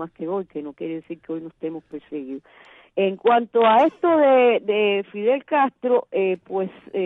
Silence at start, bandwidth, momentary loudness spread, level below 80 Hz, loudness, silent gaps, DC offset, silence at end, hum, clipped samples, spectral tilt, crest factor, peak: 0 s; 4 kHz; 17 LU; -72 dBFS; -20 LUFS; none; under 0.1%; 0 s; none; under 0.1%; -7.5 dB/octave; 16 dB; -6 dBFS